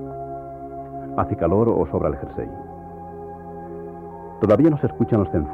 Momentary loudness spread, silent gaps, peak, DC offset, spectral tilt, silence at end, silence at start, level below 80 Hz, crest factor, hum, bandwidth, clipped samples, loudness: 19 LU; none; -4 dBFS; under 0.1%; -11 dB/octave; 0 s; 0 s; -42 dBFS; 18 dB; none; 5 kHz; under 0.1%; -21 LUFS